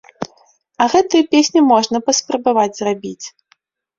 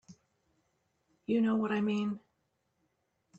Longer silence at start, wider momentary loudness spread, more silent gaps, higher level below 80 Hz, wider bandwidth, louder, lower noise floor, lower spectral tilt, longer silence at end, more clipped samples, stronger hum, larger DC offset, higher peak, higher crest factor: about the same, 0.2 s vs 0.1 s; first, 18 LU vs 14 LU; neither; first, -60 dBFS vs -78 dBFS; about the same, 7.8 kHz vs 7.8 kHz; first, -15 LUFS vs -32 LUFS; second, -59 dBFS vs -79 dBFS; second, -3 dB/octave vs -7.5 dB/octave; second, 0.7 s vs 1.2 s; neither; neither; neither; first, -2 dBFS vs -20 dBFS; about the same, 14 dB vs 16 dB